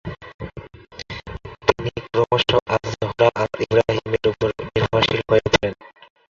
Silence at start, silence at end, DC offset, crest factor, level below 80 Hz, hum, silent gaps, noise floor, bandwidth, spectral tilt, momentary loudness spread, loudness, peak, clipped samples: 0.05 s; 0.55 s; under 0.1%; 20 dB; -42 dBFS; none; 0.34-0.39 s, 2.62-2.66 s; -40 dBFS; 7.4 kHz; -5.5 dB/octave; 18 LU; -20 LUFS; -2 dBFS; under 0.1%